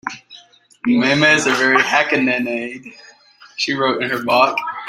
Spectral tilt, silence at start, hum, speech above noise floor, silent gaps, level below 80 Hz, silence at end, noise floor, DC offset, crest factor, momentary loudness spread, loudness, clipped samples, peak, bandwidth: -3.5 dB/octave; 0.05 s; none; 30 dB; none; -62 dBFS; 0 s; -46 dBFS; under 0.1%; 18 dB; 17 LU; -16 LUFS; under 0.1%; 0 dBFS; 16 kHz